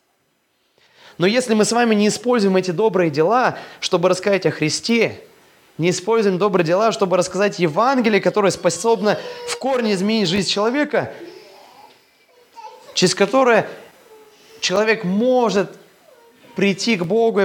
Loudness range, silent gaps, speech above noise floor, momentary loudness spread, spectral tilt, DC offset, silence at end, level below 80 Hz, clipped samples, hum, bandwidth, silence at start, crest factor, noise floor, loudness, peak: 4 LU; none; 48 dB; 7 LU; -4.5 dB/octave; under 0.1%; 0 s; -66 dBFS; under 0.1%; none; 17.5 kHz; 1.2 s; 18 dB; -65 dBFS; -18 LUFS; 0 dBFS